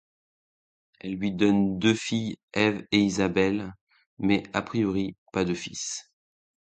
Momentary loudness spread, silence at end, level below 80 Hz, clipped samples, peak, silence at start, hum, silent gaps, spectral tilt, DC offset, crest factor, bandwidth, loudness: 10 LU; 0.8 s; -56 dBFS; under 0.1%; -6 dBFS; 1.05 s; none; 2.43-2.48 s, 3.81-3.87 s, 4.06-4.17 s, 5.18-5.26 s; -5 dB/octave; under 0.1%; 22 dB; 9.2 kHz; -26 LUFS